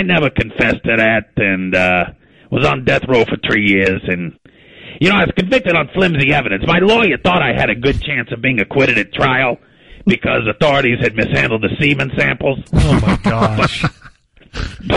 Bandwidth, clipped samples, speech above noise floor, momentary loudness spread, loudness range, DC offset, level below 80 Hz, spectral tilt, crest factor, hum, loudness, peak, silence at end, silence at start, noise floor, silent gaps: 11.5 kHz; under 0.1%; 29 dB; 7 LU; 2 LU; 0.4%; -32 dBFS; -6.5 dB/octave; 14 dB; none; -14 LUFS; 0 dBFS; 0 s; 0 s; -43 dBFS; none